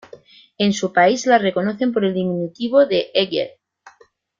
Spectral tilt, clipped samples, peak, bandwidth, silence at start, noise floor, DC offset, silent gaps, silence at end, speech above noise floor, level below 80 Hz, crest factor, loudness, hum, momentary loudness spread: -5 dB/octave; under 0.1%; -2 dBFS; 7.6 kHz; 0.6 s; -54 dBFS; under 0.1%; none; 0.9 s; 36 dB; -62 dBFS; 16 dB; -18 LUFS; none; 8 LU